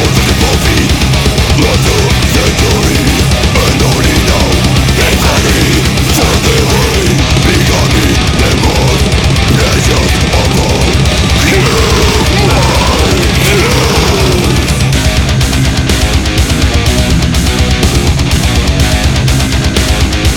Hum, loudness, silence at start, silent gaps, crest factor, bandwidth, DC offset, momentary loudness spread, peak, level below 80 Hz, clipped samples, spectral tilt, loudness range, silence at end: none; -9 LUFS; 0 s; none; 8 dB; 19.5 kHz; under 0.1%; 2 LU; 0 dBFS; -14 dBFS; under 0.1%; -4.5 dB/octave; 2 LU; 0 s